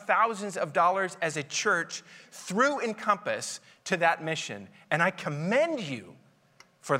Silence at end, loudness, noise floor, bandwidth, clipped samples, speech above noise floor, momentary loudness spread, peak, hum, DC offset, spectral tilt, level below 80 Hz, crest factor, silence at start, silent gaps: 0 s; -28 LUFS; -60 dBFS; 16 kHz; under 0.1%; 32 dB; 14 LU; -8 dBFS; none; under 0.1%; -3.5 dB/octave; -80 dBFS; 20 dB; 0 s; none